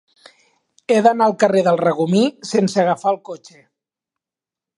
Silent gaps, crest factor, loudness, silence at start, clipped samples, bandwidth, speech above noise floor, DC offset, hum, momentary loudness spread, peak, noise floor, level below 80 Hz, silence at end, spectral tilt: none; 18 dB; -17 LUFS; 0.9 s; under 0.1%; 11.5 kHz; 72 dB; under 0.1%; none; 13 LU; 0 dBFS; -89 dBFS; -70 dBFS; 1.4 s; -6 dB/octave